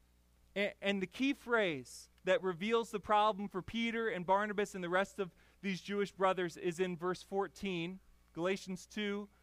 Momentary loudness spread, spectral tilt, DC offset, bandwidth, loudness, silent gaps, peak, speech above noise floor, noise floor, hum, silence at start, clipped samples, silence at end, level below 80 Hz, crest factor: 11 LU; -5 dB/octave; under 0.1%; 15.5 kHz; -37 LUFS; none; -18 dBFS; 32 dB; -69 dBFS; none; 0.55 s; under 0.1%; 0.15 s; -68 dBFS; 18 dB